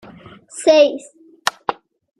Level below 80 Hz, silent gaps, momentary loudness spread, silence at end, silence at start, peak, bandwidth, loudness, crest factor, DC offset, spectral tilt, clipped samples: -64 dBFS; none; 19 LU; 0.45 s; 0.55 s; 0 dBFS; 14.5 kHz; -17 LUFS; 20 dB; under 0.1%; -2.5 dB/octave; under 0.1%